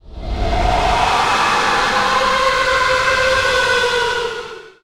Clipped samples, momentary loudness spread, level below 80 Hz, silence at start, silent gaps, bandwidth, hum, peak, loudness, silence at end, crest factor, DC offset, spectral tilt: under 0.1%; 9 LU; -28 dBFS; 0.05 s; none; 16 kHz; none; -4 dBFS; -15 LUFS; 0.15 s; 12 dB; under 0.1%; -2.5 dB/octave